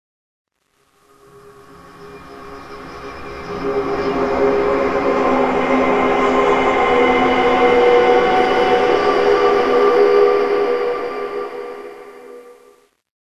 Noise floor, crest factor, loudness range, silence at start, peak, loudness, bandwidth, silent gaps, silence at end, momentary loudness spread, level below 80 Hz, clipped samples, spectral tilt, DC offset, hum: -62 dBFS; 16 dB; 10 LU; 1.35 s; 0 dBFS; -15 LUFS; 11.5 kHz; none; 0.7 s; 20 LU; -44 dBFS; under 0.1%; -5.5 dB/octave; 0.8%; none